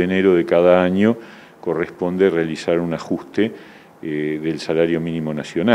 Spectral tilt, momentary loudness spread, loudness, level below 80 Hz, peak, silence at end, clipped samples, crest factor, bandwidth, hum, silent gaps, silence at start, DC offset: -7 dB/octave; 11 LU; -19 LUFS; -56 dBFS; 0 dBFS; 0 s; under 0.1%; 18 dB; 11.5 kHz; none; none; 0 s; under 0.1%